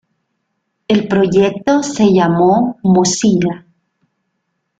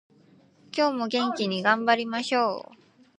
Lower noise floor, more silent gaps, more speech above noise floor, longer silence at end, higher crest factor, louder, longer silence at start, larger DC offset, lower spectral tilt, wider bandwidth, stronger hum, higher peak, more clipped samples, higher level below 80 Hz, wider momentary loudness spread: first, -70 dBFS vs -58 dBFS; neither; first, 58 dB vs 33 dB; first, 1.2 s vs 0.45 s; second, 14 dB vs 20 dB; first, -13 LUFS vs -25 LUFS; first, 0.9 s vs 0.75 s; neither; about the same, -5.5 dB/octave vs -4.5 dB/octave; about the same, 9.2 kHz vs 10 kHz; neither; first, -2 dBFS vs -6 dBFS; neither; first, -50 dBFS vs -78 dBFS; about the same, 5 LU vs 6 LU